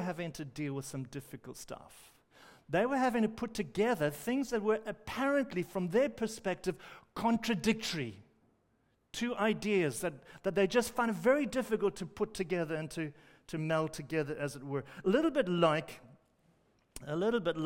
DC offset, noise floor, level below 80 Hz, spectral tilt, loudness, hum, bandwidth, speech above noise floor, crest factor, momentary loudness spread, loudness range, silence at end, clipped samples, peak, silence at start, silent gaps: under 0.1%; -74 dBFS; -64 dBFS; -5.5 dB/octave; -34 LUFS; none; 16 kHz; 41 dB; 20 dB; 14 LU; 4 LU; 0 s; under 0.1%; -14 dBFS; 0 s; none